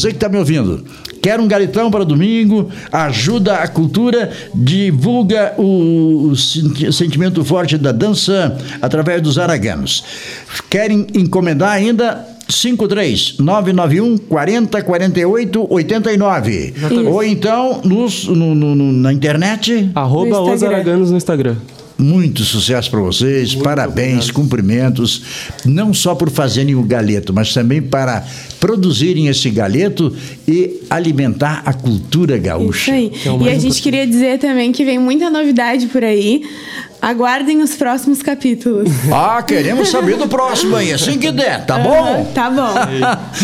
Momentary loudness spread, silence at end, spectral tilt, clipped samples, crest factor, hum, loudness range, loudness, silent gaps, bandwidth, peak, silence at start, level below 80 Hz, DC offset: 4 LU; 0 s; -5.5 dB/octave; under 0.1%; 12 dB; none; 2 LU; -13 LUFS; none; 16 kHz; 0 dBFS; 0 s; -44 dBFS; under 0.1%